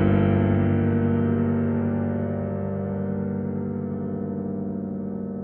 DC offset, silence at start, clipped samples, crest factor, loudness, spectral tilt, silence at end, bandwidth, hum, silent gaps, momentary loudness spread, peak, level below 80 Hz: under 0.1%; 0 s; under 0.1%; 16 dB; -25 LUFS; -13 dB/octave; 0 s; 3.4 kHz; none; none; 9 LU; -8 dBFS; -46 dBFS